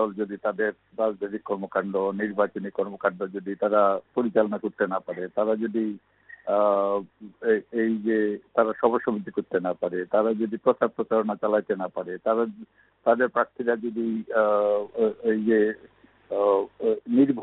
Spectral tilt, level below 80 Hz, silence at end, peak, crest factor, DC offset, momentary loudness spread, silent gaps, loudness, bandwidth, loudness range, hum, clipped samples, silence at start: -5.5 dB/octave; -70 dBFS; 0 s; -6 dBFS; 20 dB; under 0.1%; 8 LU; none; -26 LUFS; 4.1 kHz; 2 LU; none; under 0.1%; 0 s